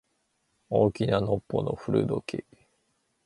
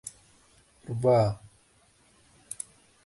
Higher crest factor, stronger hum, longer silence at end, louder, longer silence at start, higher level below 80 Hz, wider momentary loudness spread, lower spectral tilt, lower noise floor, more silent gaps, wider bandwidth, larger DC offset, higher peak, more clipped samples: about the same, 20 dB vs 20 dB; neither; second, 0.85 s vs 1.7 s; about the same, -28 LUFS vs -27 LUFS; first, 0.7 s vs 0.05 s; first, -54 dBFS vs -60 dBFS; second, 9 LU vs 21 LU; first, -8 dB/octave vs -6.5 dB/octave; first, -74 dBFS vs -63 dBFS; neither; about the same, 11.5 kHz vs 11.5 kHz; neither; about the same, -10 dBFS vs -12 dBFS; neither